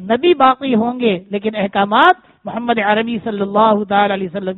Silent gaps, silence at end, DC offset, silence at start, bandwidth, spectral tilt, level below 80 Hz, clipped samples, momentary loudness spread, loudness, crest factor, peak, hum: none; 0 s; under 0.1%; 0 s; 4.2 kHz; -3 dB/octave; -56 dBFS; under 0.1%; 9 LU; -15 LUFS; 16 dB; 0 dBFS; none